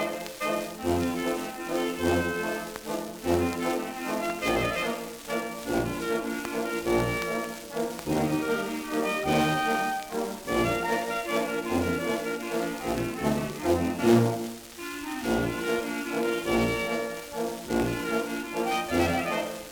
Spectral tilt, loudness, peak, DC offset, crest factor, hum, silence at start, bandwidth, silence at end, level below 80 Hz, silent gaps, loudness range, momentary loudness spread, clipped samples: -5 dB/octave; -28 LUFS; -10 dBFS; under 0.1%; 18 dB; none; 0 s; over 20 kHz; 0 s; -50 dBFS; none; 2 LU; 7 LU; under 0.1%